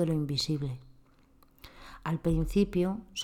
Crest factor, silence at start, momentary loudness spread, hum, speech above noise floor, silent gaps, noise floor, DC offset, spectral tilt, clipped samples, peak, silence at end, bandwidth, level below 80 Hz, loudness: 16 dB; 0 s; 17 LU; none; 31 dB; none; -61 dBFS; under 0.1%; -6 dB/octave; under 0.1%; -14 dBFS; 0 s; 16 kHz; -44 dBFS; -31 LUFS